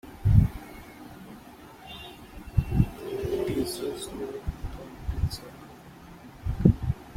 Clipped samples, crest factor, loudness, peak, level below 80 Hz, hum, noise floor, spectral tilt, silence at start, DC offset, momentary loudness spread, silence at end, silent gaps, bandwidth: under 0.1%; 26 dB; -28 LUFS; -4 dBFS; -36 dBFS; none; -48 dBFS; -7.5 dB/octave; 0.05 s; under 0.1%; 24 LU; 0 s; none; 16.5 kHz